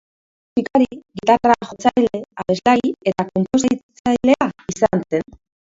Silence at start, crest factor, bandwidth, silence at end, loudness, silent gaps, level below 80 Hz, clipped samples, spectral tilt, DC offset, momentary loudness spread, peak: 0.55 s; 18 dB; 7.8 kHz; 0.55 s; -19 LUFS; 3.83-3.89 s, 3.99-4.04 s; -50 dBFS; under 0.1%; -5.5 dB/octave; under 0.1%; 8 LU; 0 dBFS